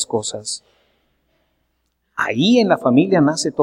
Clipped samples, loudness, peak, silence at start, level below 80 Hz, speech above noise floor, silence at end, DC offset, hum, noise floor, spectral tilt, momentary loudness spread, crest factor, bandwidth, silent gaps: under 0.1%; -17 LUFS; -2 dBFS; 0 s; -62 dBFS; 53 dB; 0 s; under 0.1%; none; -69 dBFS; -4.5 dB/octave; 14 LU; 18 dB; 12 kHz; none